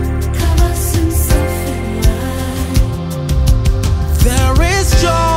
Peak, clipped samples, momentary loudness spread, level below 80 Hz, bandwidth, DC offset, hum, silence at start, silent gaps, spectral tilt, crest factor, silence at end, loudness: 0 dBFS; under 0.1%; 7 LU; -16 dBFS; 16.5 kHz; under 0.1%; none; 0 s; none; -5 dB/octave; 12 dB; 0 s; -15 LUFS